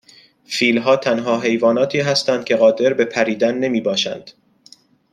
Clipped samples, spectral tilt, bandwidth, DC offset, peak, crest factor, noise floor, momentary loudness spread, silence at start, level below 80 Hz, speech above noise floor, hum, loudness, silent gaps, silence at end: under 0.1%; -4.5 dB/octave; 11.5 kHz; under 0.1%; -2 dBFS; 16 dB; -49 dBFS; 5 LU; 0.5 s; -64 dBFS; 33 dB; none; -17 LUFS; none; 0.8 s